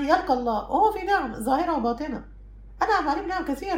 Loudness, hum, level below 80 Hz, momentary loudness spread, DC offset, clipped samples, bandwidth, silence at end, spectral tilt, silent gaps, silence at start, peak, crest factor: -25 LUFS; none; -44 dBFS; 7 LU; under 0.1%; under 0.1%; 16 kHz; 0 s; -5 dB/octave; none; 0 s; -8 dBFS; 18 dB